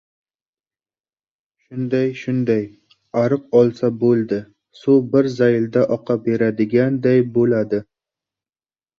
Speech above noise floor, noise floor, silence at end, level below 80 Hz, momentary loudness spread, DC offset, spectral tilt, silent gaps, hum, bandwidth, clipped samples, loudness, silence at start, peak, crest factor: over 73 dB; under -90 dBFS; 1.2 s; -60 dBFS; 10 LU; under 0.1%; -9 dB/octave; none; none; 7 kHz; under 0.1%; -18 LUFS; 1.7 s; -2 dBFS; 16 dB